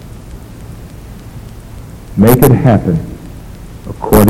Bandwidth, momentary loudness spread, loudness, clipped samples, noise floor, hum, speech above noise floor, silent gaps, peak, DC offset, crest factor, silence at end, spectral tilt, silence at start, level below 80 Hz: 17 kHz; 24 LU; -10 LUFS; 0.2%; -30 dBFS; none; 22 dB; none; 0 dBFS; under 0.1%; 12 dB; 0 s; -7 dB/octave; 0 s; -28 dBFS